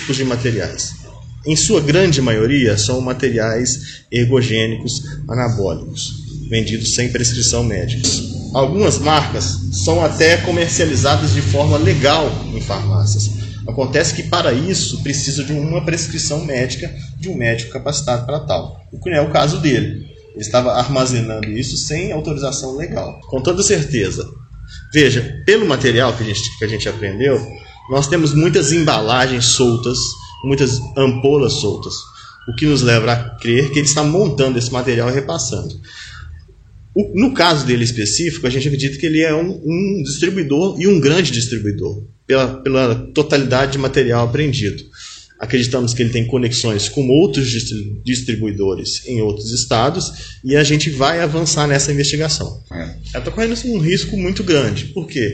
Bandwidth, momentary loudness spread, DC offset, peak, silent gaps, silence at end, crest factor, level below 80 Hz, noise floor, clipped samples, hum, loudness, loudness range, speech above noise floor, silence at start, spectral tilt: 9.2 kHz; 12 LU; under 0.1%; 0 dBFS; none; 0 s; 16 dB; -36 dBFS; -41 dBFS; under 0.1%; none; -16 LUFS; 4 LU; 26 dB; 0 s; -4.5 dB/octave